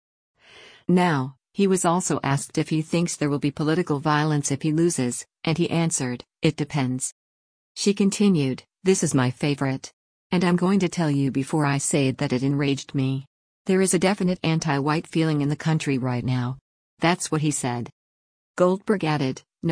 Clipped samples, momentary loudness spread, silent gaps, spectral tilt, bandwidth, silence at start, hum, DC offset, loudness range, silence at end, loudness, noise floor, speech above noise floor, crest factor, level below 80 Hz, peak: under 0.1%; 8 LU; 7.12-7.75 s, 9.93-10.30 s, 13.27-13.65 s, 16.61-16.97 s, 17.92-18.54 s; -5.5 dB/octave; 10.5 kHz; 0.55 s; none; under 0.1%; 2 LU; 0 s; -23 LUFS; -50 dBFS; 27 dB; 16 dB; -60 dBFS; -8 dBFS